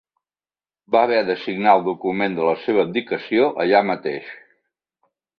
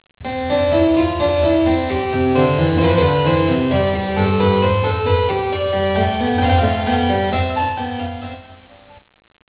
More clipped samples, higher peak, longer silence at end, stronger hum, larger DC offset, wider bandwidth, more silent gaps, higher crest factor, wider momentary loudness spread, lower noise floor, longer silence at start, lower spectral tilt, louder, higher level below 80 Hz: neither; about the same, -2 dBFS vs -2 dBFS; about the same, 1.05 s vs 0.95 s; neither; neither; first, 5.4 kHz vs 4 kHz; neither; first, 20 dB vs 14 dB; about the same, 8 LU vs 8 LU; first, under -90 dBFS vs -45 dBFS; first, 0.9 s vs 0.2 s; second, -8 dB/octave vs -11 dB/octave; about the same, -19 LUFS vs -17 LUFS; second, -66 dBFS vs -30 dBFS